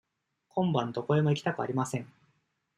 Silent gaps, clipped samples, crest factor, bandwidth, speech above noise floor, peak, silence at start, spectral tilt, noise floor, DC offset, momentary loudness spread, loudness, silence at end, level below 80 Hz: none; under 0.1%; 18 dB; 12.5 kHz; 46 dB; -14 dBFS; 0.55 s; -6.5 dB/octave; -75 dBFS; under 0.1%; 9 LU; -30 LUFS; 0.7 s; -70 dBFS